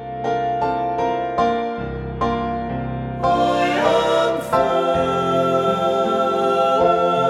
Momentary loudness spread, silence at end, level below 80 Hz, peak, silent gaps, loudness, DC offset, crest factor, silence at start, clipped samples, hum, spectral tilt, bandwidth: 8 LU; 0 s; -42 dBFS; -4 dBFS; none; -19 LUFS; under 0.1%; 16 dB; 0 s; under 0.1%; none; -6 dB/octave; 14 kHz